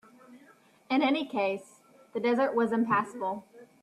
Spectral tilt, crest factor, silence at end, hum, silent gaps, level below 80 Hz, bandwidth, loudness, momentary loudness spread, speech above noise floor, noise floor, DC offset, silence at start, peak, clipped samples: -6 dB/octave; 16 dB; 0.2 s; none; none; -78 dBFS; 12.5 kHz; -29 LUFS; 11 LU; 31 dB; -60 dBFS; under 0.1%; 0.3 s; -14 dBFS; under 0.1%